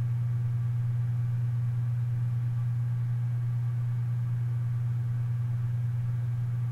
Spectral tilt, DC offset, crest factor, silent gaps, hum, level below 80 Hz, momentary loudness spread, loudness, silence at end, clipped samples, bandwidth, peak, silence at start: -9.5 dB/octave; under 0.1%; 6 dB; none; none; -58 dBFS; 1 LU; -30 LUFS; 0 s; under 0.1%; 2.7 kHz; -22 dBFS; 0 s